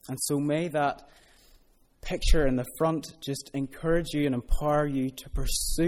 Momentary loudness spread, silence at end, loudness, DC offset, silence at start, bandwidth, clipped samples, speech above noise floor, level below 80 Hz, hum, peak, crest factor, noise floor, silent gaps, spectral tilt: 9 LU; 0 s; -29 LUFS; under 0.1%; 0.05 s; 16 kHz; under 0.1%; 34 dB; -32 dBFS; none; -8 dBFS; 20 dB; -60 dBFS; none; -5 dB/octave